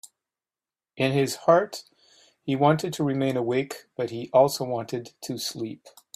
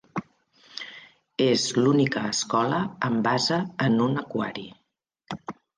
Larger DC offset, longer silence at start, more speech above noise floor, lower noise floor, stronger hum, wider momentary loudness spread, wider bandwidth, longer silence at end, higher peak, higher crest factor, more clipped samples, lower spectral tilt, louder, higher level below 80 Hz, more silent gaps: neither; about the same, 0.05 s vs 0.15 s; first, over 65 dB vs 46 dB; first, under -90 dBFS vs -70 dBFS; neither; second, 14 LU vs 17 LU; first, 16 kHz vs 10 kHz; about the same, 0.25 s vs 0.25 s; first, -6 dBFS vs -10 dBFS; about the same, 20 dB vs 16 dB; neither; about the same, -5.5 dB/octave vs -4.5 dB/octave; about the same, -25 LUFS vs -24 LUFS; about the same, -68 dBFS vs -66 dBFS; neither